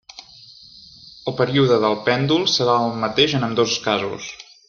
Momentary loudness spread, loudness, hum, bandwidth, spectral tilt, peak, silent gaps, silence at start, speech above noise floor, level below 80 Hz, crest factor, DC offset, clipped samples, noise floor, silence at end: 14 LU; -19 LUFS; none; 7.2 kHz; -4.5 dB/octave; -2 dBFS; none; 0.15 s; 26 dB; -58 dBFS; 18 dB; under 0.1%; under 0.1%; -45 dBFS; 0.25 s